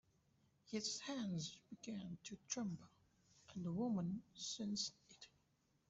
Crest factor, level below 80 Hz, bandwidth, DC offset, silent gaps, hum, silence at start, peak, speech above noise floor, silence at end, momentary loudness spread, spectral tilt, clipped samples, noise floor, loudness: 20 dB; -80 dBFS; 8.2 kHz; under 0.1%; none; none; 0.65 s; -28 dBFS; 34 dB; 0.6 s; 14 LU; -4 dB/octave; under 0.1%; -81 dBFS; -46 LUFS